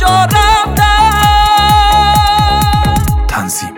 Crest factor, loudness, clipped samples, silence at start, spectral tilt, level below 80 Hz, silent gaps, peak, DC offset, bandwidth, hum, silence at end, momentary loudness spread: 8 dB; -9 LUFS; under 0.1%; 0 s; -3.5 dB/octave; -16 dBFS; none; 0 dBFS; under 0.1%; 20 kHz; none; 0 s; 6 LU